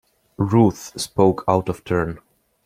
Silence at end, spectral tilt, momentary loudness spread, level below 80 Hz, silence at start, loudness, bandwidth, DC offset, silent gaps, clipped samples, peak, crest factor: 0.5 s; -6.5 dB/octave; 12 LU; -48 dBFS; 0.4 s; -20 LUFS; 16 kHz; under 0.1%; none; under 0.1%; -2 dBFS; 20 dB